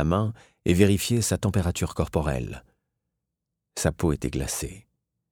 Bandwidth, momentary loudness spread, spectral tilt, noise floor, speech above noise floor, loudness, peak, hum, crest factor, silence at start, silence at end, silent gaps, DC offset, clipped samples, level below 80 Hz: 18.5 kHz; 12 LU; -5.5 dB/octave; -84 dBFS; 59 dB; -25 LUFS; -4 dBFS; none; 22 dB; 0 s; 0.5 s; none; under 0.1%; under 0.1%; -40 dBFS